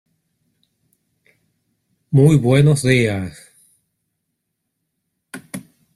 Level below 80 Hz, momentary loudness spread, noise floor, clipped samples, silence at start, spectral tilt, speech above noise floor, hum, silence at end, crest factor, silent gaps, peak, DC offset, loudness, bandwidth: -52 dBFS; 22 LU; -76 dBFS; under 0.1%; 2.1 s; -6.5 dB/octave; 62 dB; none; 0.35 s; 18 dB; none; -2 dBFS; under 0.1%; -15 LUFS; 12.5 kHz